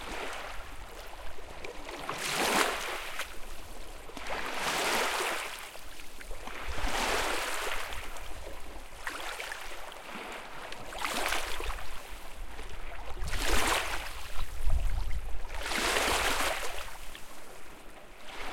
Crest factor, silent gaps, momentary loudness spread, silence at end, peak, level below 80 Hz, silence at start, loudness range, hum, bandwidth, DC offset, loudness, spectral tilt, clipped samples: 22 dB; none; 18 LU; 0 s; -10 dBFS; -40 dBFS; 0 s; 6 LU; none; 17 kHz; under 0.1%; -33 LUFS; -2 dB/octave; under 0.1%